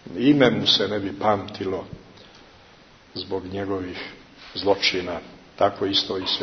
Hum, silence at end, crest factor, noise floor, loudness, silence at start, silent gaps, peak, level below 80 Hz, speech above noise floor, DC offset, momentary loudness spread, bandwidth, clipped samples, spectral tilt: none; 0 s; 22 dB; -51 dBFS; -22 LUFS; 0.05 s; none; -2 dBFS; -56 dBFS; 28 dB; under 0.1%; 18 LU; 6.6 kHz; under 0.1%; -5 dB/octave